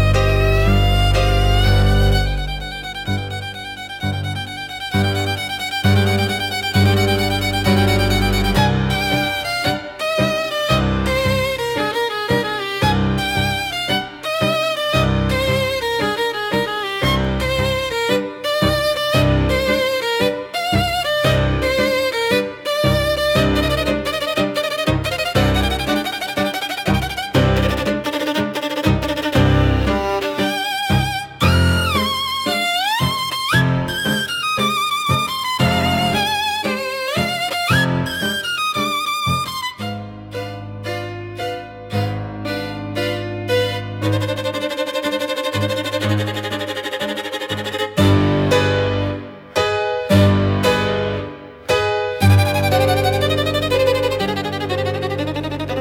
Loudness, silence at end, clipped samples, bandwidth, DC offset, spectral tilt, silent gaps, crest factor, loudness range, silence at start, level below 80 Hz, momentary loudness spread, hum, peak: -18 LUFS; 0 s; under 0.1%; 18 kHz; under 0.1%; -5 dB/octave; none; 16 dB; 5 LU; 0 s; -30 dBFS; 8 LU; none; -2 dBFS